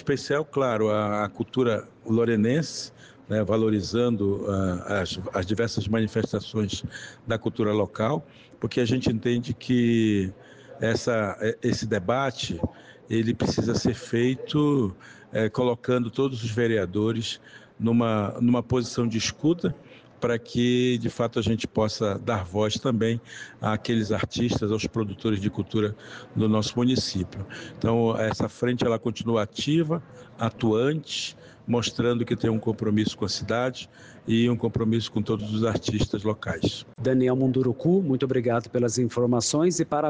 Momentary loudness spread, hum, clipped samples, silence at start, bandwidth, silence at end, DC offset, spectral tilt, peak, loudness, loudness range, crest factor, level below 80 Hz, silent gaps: 8 LU; none; under 0.1%; 0 s; 9.8 kHz; 0 s; under 0.1%; -6 dB/octave; -12 dBFS; -26 LUFS; 2 LU; 12 dB; -52 dBFS; none